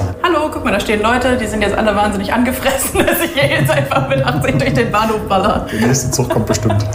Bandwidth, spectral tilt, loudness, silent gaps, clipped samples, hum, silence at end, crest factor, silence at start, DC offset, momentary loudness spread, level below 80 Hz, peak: 16 kHz; -5 dB/octave; -14 LUFS; none; under 0.1%; none; 0 s; 14 dB; 0 s; under 0.1%; 2 LU; -32 dBFS; -2 dBFS